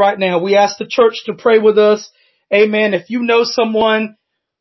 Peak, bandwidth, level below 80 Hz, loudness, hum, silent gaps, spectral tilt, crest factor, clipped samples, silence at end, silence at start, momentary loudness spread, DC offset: -2 dBFS; 6.2 kHz; -60 dBFS; -13 LUFS; none; none; -4.5 dB/octave; 12 dB; under 0.1%; 0.5 s; 0 s; 7 LU; under 0.1%